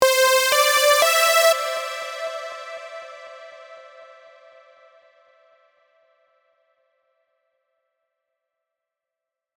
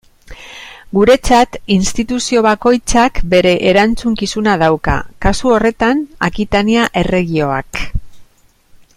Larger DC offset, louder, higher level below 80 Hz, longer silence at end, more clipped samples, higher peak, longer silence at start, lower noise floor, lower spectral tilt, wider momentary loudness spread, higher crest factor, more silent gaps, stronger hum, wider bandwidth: neither; second, -17 LUFS vs -13 LUFS; second, -74 dBFS vs -28 dBFS; first, 5.55 s vs 0.75 s; neither; about the same, -2 dBFS vs 0 dBFS; second, 0 s vs 0.3 s; first, -86 dBFS vs -50 dBFS; second, 2.5 dB/octave vs -5 dB/octave; first, 24 LU vs 10 LU; first, 22 dB vs 14 dB; neither; neither; first, over 20 kHz vs 15.5 kHz